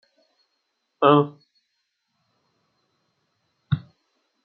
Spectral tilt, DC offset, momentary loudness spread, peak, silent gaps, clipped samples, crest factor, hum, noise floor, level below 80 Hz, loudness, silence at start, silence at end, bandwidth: -6 dB/octave; under 0.1%; 12 LU; -2 dBFS; none; under 0.1%; 26 dB; none; -76 dBFS; -66 dBFS; -21 LUFS; 1 s; 0.65 s; 4.6 kHz